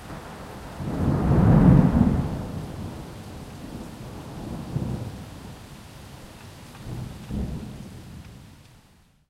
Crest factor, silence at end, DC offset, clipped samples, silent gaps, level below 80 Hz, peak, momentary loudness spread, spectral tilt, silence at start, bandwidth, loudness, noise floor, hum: 22 dB; 0.8 s; under 0.1%; under 0.1%; none; -36 dBFS; -4 dBFS; 26 LU; -8.5 dB/octave; 0 s; 15 kHz; -23 LUFS; -57 dBFS; none